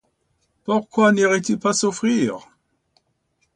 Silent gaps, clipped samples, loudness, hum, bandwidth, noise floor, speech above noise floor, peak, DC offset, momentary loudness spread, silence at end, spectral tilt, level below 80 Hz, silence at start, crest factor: none; under 0.1%; -19 LUFS; none; 10.5 kHz; -69 dBFS; 50 dB; -4 dBFS; under 0.1%; 9 LU; 1.15 s; -4.5 dB/octave; -64 dBFS; 0.65 s; 16 dB